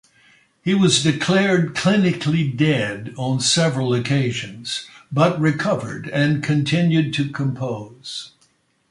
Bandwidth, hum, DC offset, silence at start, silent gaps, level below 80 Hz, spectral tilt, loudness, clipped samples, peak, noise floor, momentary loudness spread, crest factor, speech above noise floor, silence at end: 11.5 kHz; none; under 0.1%; 0.65 s; none; -58 dBFS; -5 dB/octave; -19 LUFS; under 0.1%; -2 dBFS; -62 dBFS; 11 LU; 18 dB; 42 dB; 0.6 s